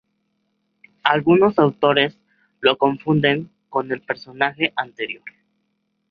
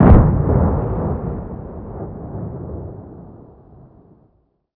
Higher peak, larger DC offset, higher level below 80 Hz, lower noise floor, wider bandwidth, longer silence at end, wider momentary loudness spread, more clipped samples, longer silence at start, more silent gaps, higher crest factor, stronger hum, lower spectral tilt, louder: about the same, -2 dBFS vs 0 dBFS; neither; second, -62 dBFS vs -24 dBFS; first, -71 dBFS vs -61 dBFS; first, 5.2 kHz vs 3.2 kHz; second, 0.8 s vs 1.45 s; second, 12 LU vs 22 LU; neither; first, 1.05 s vs 0 s; neither; about the same, 20 dB vs 18 dB; neither; second, -8 dB/octave vs -14 dB/octave; about the same, -19 LUFS vs -20 LUFS